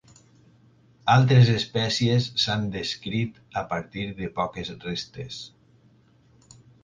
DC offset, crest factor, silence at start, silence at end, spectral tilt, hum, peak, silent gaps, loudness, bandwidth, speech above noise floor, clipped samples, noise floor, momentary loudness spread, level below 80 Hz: under 0.1%; 20 dB; 1.05 s; 1.35 s; -5.5 dB/octave; none; -6 dBFS; none; -24 LUFS; 7.6 kHz; 35 dB; under 0.1%; -58 dBFS; 17 LU; -54 dBFS